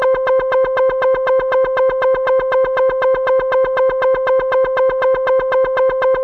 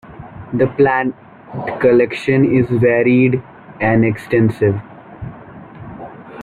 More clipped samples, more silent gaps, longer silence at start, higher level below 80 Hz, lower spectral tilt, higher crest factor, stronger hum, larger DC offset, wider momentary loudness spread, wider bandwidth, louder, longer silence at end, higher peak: neither; neither; about the same, 0 s vs 0.1 s; about the same, -44 dBFS vs -48 dBFS; second, -5.5 dB/octave vs -9 dB/octave; second, 8 dB vs 14 dB; neither; neither; second, 1 LU vs 21 LU; second, 4.5 kHz vs 11 kHz; about the same, -15 LUFS vs -15 LUFS; about the same, 0 s vs 0 s; second, -6 dBFS vs -2 dBFS